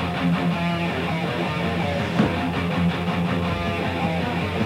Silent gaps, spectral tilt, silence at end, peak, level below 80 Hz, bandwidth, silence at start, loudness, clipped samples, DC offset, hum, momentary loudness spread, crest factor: none; -7 dB/octave; 0 s; -6 dBFS; -44 dBFS; 13 kHz; 0 s; -23 LUFS; under 0.1%; under 0.1%; none; 3 LU; 16 dB